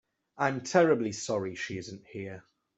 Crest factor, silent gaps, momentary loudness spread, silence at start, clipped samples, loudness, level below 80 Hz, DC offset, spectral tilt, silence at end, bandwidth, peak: 22 dB; none; 18 LU; 0.35 s; under 0.1%; -29 LUFS; -70 dBFS; under 0.1%; -5 dB/octave; 0.35 s; 8.2 kHz; -8 dBFS